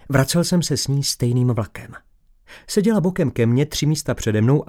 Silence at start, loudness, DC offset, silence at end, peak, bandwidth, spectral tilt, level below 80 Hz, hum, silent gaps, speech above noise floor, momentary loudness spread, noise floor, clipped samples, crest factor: 0.05 s; -20 LUFS; under 0.1%; 0.05 s; -2 dBFS; 17 kHz; -5.5 dB/octave; -44 dBFS; none; none; 30 dB; 5 LU; -49 dBFS; under 0.1%; 18 dB